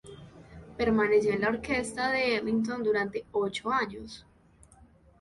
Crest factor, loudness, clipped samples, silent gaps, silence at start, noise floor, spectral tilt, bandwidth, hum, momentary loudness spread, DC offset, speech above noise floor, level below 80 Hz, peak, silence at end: 16 dB; -28 LUFS; under 0.1%; none; 0.05 s; -59 dBFS; -5 dB/octave; 11.5 kHz; none; 21 LU; under 0.1%; 30 dB; -56 dBFS; -14 dBFS; 1 s